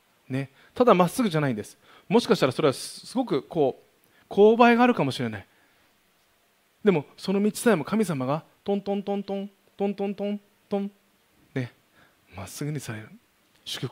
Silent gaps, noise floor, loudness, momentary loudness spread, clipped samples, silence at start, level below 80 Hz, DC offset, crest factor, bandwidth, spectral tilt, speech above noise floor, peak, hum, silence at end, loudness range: none; -65 dBFS; -25 LUFS; 17 LU; under 0.1%; 0.3 s; -68 dBFS; under 0.1%; 24 dB; 16 kHz; -6 dB/octave; 41 dB; -2 dBFS; none; 0 s; 11 LU